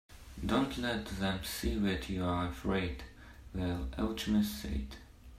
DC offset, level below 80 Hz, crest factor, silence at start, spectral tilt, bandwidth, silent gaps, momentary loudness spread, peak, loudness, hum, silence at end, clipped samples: under 0.1%; -46 dBFS; 18 dB; 0.1 s; -5.5 dB/octave; 16 kHz; none; 15 LU; -16 dBFS; -35 LUFS; none; 0 s; under 0.1%